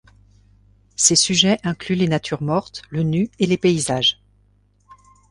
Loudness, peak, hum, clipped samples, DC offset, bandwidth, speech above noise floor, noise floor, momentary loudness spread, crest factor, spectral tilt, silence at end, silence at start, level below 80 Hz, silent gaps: -18 LUFS; -2 dBFS; 50 Hz at -40 dBFS; under 0.1%; under 0.1%; 11.5 kHz; 39 dB; -58 dBFS; 10 LU; 20 dB; -3.5 dB/octave; 1.15 s; 1 s; -52 dBFS; none